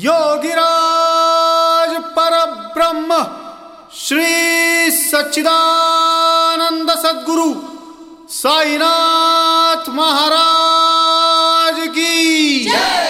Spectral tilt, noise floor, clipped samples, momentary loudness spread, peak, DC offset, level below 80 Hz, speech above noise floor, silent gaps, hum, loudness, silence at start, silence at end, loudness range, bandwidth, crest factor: -0.5 dB/octave; -36 dBFS; under 0.1%; 6 LU; -2 dBFS; under 0.1%; -58 dBFS; 23 dB; none; none; -12 LUFS; 0 s; 0 s; 3 LU; 16.5 kHz; 12 dB